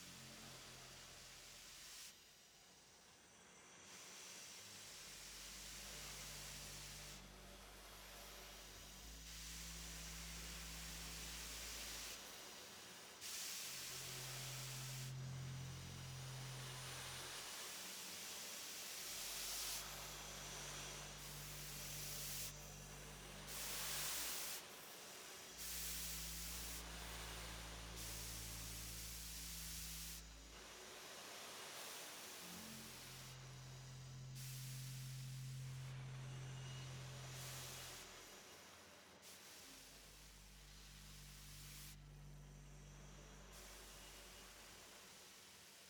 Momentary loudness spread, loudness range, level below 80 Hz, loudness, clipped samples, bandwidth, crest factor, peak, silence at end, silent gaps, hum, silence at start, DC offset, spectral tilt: 13 LU; 11 LU; -64 dBFS; -51 LUFS; under 0.1%; over 20 kHz; 20 dB; -34 dBFS; 0 s; none; none; 0 s; under 0.1%; -2 dB/octave